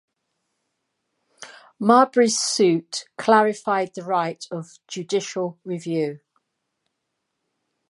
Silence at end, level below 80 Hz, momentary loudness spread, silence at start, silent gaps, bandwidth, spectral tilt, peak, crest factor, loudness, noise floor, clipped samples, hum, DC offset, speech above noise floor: 1.75 s; -78 dBFS; 17 LU; 1.4 s; none; 11.5 kHz; -4 dB/octave; -2 dBFS; 22 dB; -21 LUFS; -78 dBFS; under 0.1%; none; under 0.1%; 57 dB